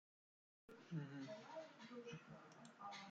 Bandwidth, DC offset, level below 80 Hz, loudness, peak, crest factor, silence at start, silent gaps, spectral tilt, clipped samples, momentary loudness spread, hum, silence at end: 8.8 kHz; under 0.1%; under -90 dBFS; -56 LUFS; -38 dBFS; 20 dB; 0.7 s; none; -6 dB/octave; under 0.1%; 11 LU; none; 0 s